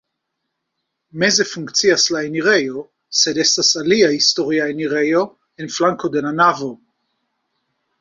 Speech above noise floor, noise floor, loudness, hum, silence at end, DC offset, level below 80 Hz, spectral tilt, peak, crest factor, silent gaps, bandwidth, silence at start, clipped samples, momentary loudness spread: 59 dB; -76 dBFS; -16 LUFS; none; 1.25 s; under 0.1%; -62 dBFS; -2.5 dB/octave; -2 dBFS; 18 dB; none; 7.8 kHz; 1.15 s; under 0.1%; 13 LU